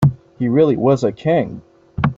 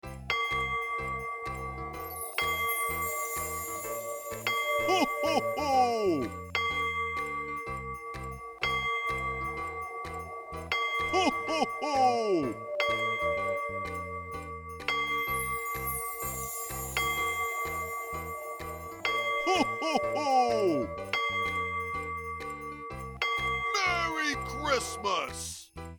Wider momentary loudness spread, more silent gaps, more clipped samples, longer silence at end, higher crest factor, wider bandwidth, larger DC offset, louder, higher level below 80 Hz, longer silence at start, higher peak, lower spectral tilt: first, 15 LU vs 11 LU; neither; neither; about the same, 0.05 s vs 0 s; about the same, 14 dB vs 18 dB; second, 7.6 kHz vs over 20 kHz; neither; first, -17 LUFS vs -31 LUFS; first, -46 dBFS vs -52 dBFS; about the same, 0 s vs 0.05 s; first, -2 dBFS vs -14 dBFS; first, -9 dB/octave vs -3 dB/octave